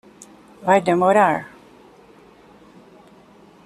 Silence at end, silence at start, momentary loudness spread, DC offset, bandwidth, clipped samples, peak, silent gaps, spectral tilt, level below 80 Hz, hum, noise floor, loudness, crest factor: 2.2 s; 0.6 s; 13 LU; under 0.1%; 14 kHz; under 0.1%; -2 dBFS; none; -6 dB/octave; -62 dBFS; none; -49 dBFS; -18 LUFS; 20 dB